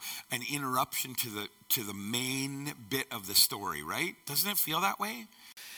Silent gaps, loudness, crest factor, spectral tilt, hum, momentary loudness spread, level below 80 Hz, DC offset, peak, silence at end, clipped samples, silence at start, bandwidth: none; -31 LUFS; 24 dB; -2 dB/octave; none; 11 LU; -70 dBFS; under 0.1%; -10 dBFS; 0 s; under 0.1%; 0 s; 17.5 kHz